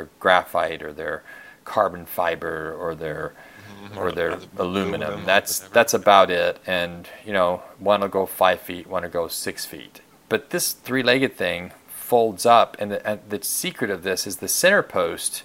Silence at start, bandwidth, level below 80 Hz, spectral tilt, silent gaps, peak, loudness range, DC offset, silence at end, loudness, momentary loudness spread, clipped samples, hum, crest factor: 0 s; 16.5 kHz; -58 dBFS; -3 dB/octave; none; 0 dBFS; 7 LU; under 0.1%; 0 s; -22 LUFS; 14 LU; under 0.1%; none; 22 dB